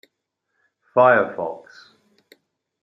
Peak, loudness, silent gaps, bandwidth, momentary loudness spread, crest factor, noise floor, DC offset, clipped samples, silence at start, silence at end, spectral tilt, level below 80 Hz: -2 dBFS; -19 LUFS; none; 6 kHz; 16 LU; 20 dB; -77 dBFS; under 0.1%; under 0.1%; 0.95 s; 1.25 s; -7.5 dB/octave; -76 dBFS